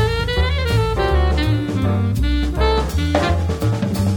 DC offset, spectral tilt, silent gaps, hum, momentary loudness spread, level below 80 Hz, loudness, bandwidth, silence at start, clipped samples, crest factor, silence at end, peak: under 0.1%; -6.5 dB/octave; none; none; 2 LU; -22 dBFS; -19 LUFS; 18 kHz; 0 s; under 0.1%; 16 dB; 0 s; -2 dBFS